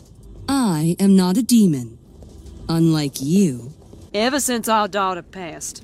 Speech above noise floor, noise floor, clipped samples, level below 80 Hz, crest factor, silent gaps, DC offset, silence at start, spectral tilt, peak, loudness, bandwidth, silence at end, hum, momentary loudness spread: 23 dB; -41 dBFS; under 0.1%; -46 dBFS; 14 dB; none; under 0.1%; 0.25 s; -5.5 dB/octave; -4 dBFS; -19 LUFS; 16 kHz; 0.05 s; none; 18 LU